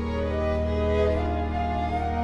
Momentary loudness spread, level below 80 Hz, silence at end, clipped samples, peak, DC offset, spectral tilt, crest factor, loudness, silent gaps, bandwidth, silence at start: 4 LU; -32 dBFS; 0 s; under 0.1%; -12 dBFS; under 0.1%; -8 dB/octave; 14 dB; -26 LUFS; none; 7 kHz; 0 s